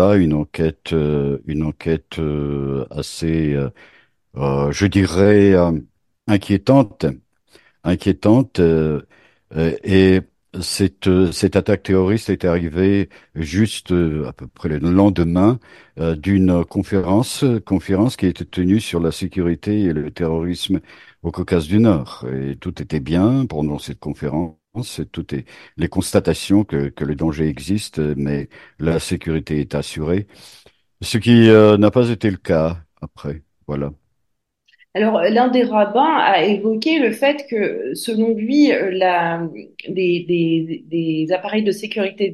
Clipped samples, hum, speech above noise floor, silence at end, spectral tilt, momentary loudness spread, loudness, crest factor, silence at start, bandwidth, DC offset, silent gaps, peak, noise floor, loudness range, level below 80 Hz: under 0.1%; none; 56 dB; 0 s; -6.5 dB/octave; 13 LU; -18 LUFS; 18 dB; 0 s; 12.5 kHz; under 0.1%; none; 0 dBFS; -73 dBFS; 6 LU; -40 dBFS